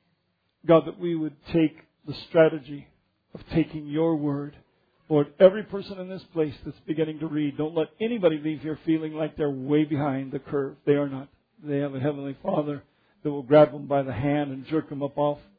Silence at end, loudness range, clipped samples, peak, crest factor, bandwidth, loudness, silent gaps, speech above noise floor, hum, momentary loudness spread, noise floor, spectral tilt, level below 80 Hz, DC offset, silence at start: 0.2 s; 3 LU; under 0.1%; -4 dBFS; 22 dB; 5 kHz; -25 LUFS; none; 48 dB; none; 14 LU; -73 dBFS; -10.5 dB/octave; -58 dBFS; under 0.1%; 0.65 s